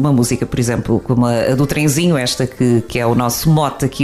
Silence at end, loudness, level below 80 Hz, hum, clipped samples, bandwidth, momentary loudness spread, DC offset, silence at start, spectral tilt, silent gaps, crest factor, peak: 0 s; -15 LUFS; -38 dBFS; none; under 0.1%; 15.5 kHz; 4 LU; under 0.1%; 0 s; -5.5 dB/octave; none; 12 dB; -2 dBFS